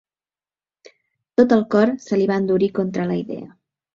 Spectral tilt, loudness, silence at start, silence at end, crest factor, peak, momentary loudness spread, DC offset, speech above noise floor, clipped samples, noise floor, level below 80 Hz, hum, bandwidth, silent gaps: -7.5 dB/octave; -19 LUFS; 1.4 s; 0.5 s; 18 dB; -2 dBFS; 10 LU; under 0.1%; over 72 dB; under 0.1%; under -90 dBFS; -62 dBFS; none; 7.4 kHz; none